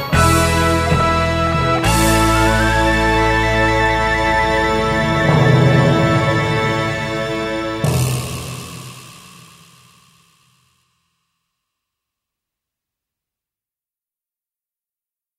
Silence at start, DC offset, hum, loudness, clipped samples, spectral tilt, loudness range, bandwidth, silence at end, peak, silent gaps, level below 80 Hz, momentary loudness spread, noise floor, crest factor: 0 s; under 0.1%; none; -15 LUFS; under 0.1%; -5 dB/octave; 10 LU; 16 kHz; 6.2 s; 0 dBFS; none; -30 dBFS; 9 LU; under -90 dBFS; 16 dB